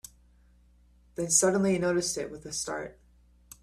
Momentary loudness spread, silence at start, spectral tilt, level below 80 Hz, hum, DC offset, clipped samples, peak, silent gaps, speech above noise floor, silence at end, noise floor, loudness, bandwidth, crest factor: 21 LU; 1.2 s; -3.5 dB/octave; -60 dBFS; 60 Hz at -55 dBFS; under 0.1%; under 0.1%; -8 dBFS; none; 32 dB; 0.7 s; -60 dBFS; -27 LUFS; 15 kHz; 22 dB